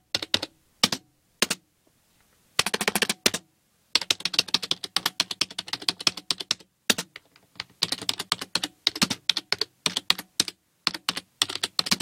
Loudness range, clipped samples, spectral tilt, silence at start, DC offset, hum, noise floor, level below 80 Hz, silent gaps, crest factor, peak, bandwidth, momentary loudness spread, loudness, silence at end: 2 LU; under 0.1%; -0.5 dB/octave; 0.15 s; under 0.1%; none; -66 dBFS; -66 dBFS; none; 28 dB; -2 dBFS; 17 kHz; 7 LU; -26 LUFS; 0 s